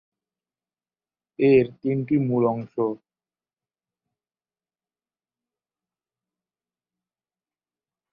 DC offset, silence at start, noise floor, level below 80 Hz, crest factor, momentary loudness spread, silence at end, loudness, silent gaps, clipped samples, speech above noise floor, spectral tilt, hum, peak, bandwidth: under 0.1%; 1.4 s; under -90 dBFS; -64 dBFS; 22 dB; 9 LU; 5.15 s; -22 LUFS; none; under 0.1%; over 69 dB; -11.5 dB/octave; none; -6 dBFS; 4.8 kHz